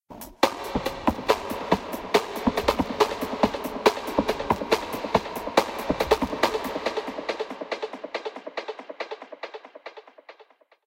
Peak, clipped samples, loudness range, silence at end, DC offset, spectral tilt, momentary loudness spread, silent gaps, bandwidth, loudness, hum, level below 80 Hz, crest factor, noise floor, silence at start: 0 dBFS; under 0.1%; 10 LU; 0.45 s; under 0.1%; -4.5 dB/octave; 14 LU; none; 17 kHz; -27 LUFS; none; -48 dBFS; 26 dB; -56 dBFS; 0.1 s